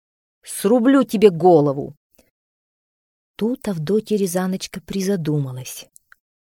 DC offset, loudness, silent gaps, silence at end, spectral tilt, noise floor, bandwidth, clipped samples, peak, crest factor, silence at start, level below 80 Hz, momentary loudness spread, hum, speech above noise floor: under 0.1%; -19 LUFS; 1.97-2.10 s, 2.31-3.34 s; 0.7 s; -6 dB/octave; under -90 dBFS; 18.5 kHz; under 0.1%; 0 dBFS; 20 dB; 0.45 s; -58 dBFS; 16 LU; none; over 72 dB